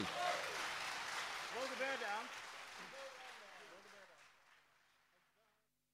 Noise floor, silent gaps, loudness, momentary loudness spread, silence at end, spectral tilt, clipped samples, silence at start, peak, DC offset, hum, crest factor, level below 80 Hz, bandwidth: -82 dBFS; none; -44 LUFS; 19 LU; 1.35 s; -1.5 dB/octave; under 0.1%; 0 s; -26 dBFS; under 0.1%; 50 Hz at -95 dBFS; 20 dB; -82 dBFS; 16 kHz